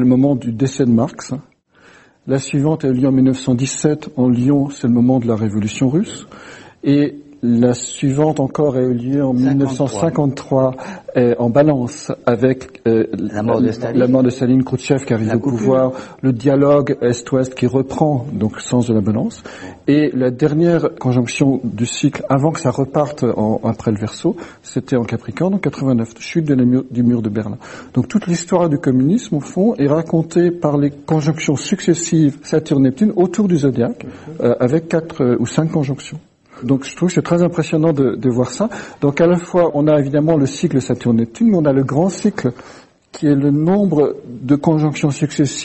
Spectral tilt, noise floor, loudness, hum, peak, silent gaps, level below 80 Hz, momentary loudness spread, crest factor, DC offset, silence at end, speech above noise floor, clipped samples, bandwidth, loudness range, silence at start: -7 dB/octave; -48 dBFS; -16 LUFS; none; 0 dBFS; none; -50 dBFS; 7 LU; 16 dB; under 0.1%; 0 s; 32 dB; under 0.1%; 8.6 kHz; 2 LU; 0 s